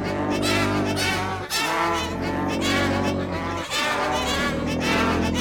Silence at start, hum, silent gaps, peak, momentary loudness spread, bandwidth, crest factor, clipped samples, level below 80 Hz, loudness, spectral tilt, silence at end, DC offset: 0 s; none; none; -8 dBFS; 5 LU; 17.5 kHz; 16 dB; under 0.1%; -42 dBFS; -23 LUFS; -4 dB/octave; 0 s; under 0.1%